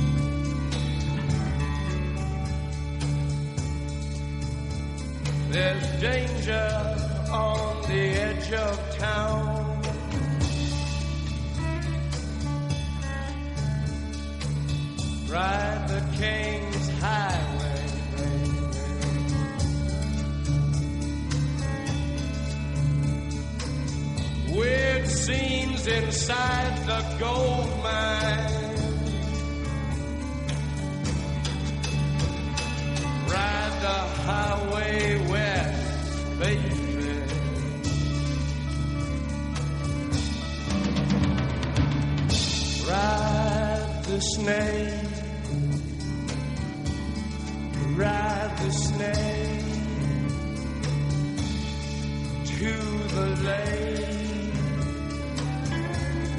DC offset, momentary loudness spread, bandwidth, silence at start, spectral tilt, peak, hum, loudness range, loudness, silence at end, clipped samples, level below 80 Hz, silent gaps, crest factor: under 0.1%; 6 LU; 11.5 kHz; 0 s; -5.5 dB/octave; -10 dBFS; none; 4 LU; -28 LUFS; 0 s; under 0.1%; -34 dBFS; none; 16 dB